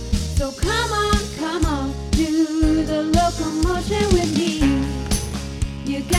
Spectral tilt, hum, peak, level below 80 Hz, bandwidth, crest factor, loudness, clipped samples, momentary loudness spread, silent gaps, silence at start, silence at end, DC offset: -5 dB/octave; none; -4 dBFS; -26 dBFS; 16 kHz; 16 dB; -21 LUFS; under 0.1%; 7 LU; none; 0 s; 0 s; under 0.1%